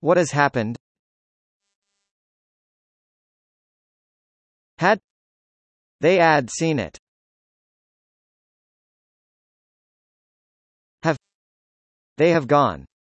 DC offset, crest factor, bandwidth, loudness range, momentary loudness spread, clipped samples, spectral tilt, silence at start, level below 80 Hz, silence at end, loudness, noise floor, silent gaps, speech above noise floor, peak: under 0.1%; 22 dB; 8.8 kHz; 11 LU; 11 LU; under 0.1%; -5.5 dB/octave; 0.05 s; -62 dBFS; 0.25 s; -20 LUFS; under -90 dBFS; 0.80-1.60 s, 1.75-1.82 s, 2.11-4.77 s, 5.04-5.99 s, 6.99-10.98 s, 11.35-12.16 s; over 71 dB; -4 dBFS